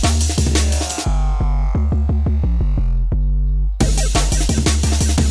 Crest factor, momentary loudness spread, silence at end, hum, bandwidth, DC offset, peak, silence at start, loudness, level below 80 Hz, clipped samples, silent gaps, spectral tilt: 12 dB; 4 LU; 0 s; none; 11 kHz; under 0.1%; -4 dBFS; 0 s; -18 LUFS; -16 dBFS; under 0.1%; none; -4.5 dB/octave